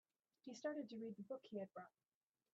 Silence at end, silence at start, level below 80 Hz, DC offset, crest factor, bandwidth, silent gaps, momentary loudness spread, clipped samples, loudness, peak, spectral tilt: 0.65 s; 0.45 s; under -90 dBFS; under 0.1%; 18 dB; 7.4 kHz; none; 13 LU; under 0.1%; -52 LUFS; -34 dBFS; -5 dB/octave